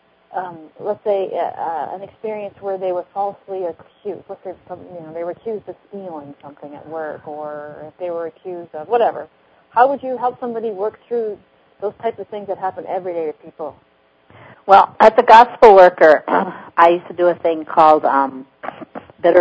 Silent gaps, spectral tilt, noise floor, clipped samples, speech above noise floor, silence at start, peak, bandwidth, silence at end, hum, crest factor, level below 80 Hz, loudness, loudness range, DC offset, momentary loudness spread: none; -6 dB/octave; -51 dBFS; 0.4%; 35 dB; 0.35 s; 0 dBFS; 8 kHz; 0 s; none; 18 dB; -58 dBFS; -15 LUFS; 19 LU; under 0.1%; 23 LU